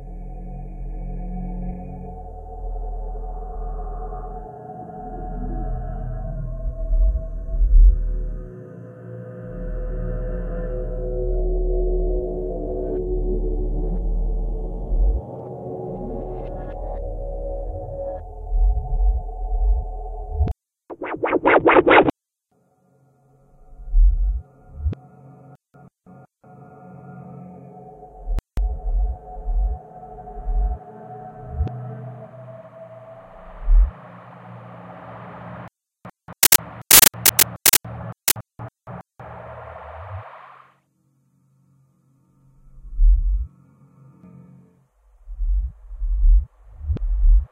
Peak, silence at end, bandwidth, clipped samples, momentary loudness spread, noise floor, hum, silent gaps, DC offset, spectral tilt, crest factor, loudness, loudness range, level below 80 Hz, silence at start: 0 dBFS; 0.05 s; 16 kHz; under 0.1%; 24 LU; -69 dBFS; none; none; under 0.1%; -3.5 dB/octave; 22 dB; -22 LUFS; 18 LU; -24 dBFS; 0 s